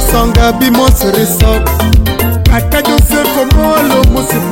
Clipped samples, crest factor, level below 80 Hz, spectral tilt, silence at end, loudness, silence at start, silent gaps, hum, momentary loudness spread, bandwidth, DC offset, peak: 0.5%; 8 dB; -12 dBFS; -5 dB/octave; 0 s; -9 LUFS; 0 s; none; none; 2 LU; 17 kHz; under 0.1%; 0 dBFS